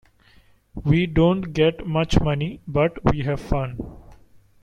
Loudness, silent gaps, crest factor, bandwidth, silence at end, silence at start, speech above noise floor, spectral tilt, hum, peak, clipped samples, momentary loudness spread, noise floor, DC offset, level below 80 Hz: -22 LUFS; none; 20 dB; 9.4 kHz; 0.5 s; 0.75 s; 34 dB; -7.5 dB/octave; none; -2 dBFS; under 0.1%; 11 LU; -55 dBFS; under 0.1%; -34 dBFS